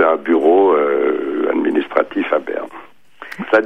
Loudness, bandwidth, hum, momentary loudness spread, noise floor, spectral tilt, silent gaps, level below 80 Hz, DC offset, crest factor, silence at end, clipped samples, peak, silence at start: -16 LUFS; 5.8 kHz; none; 15 LU; -40 dBFS; -6.5 dB/octave; none; -66 dBFS; 0.6%; 16 dB; 0 s; under 0.1%; 0 dBFS; 0 s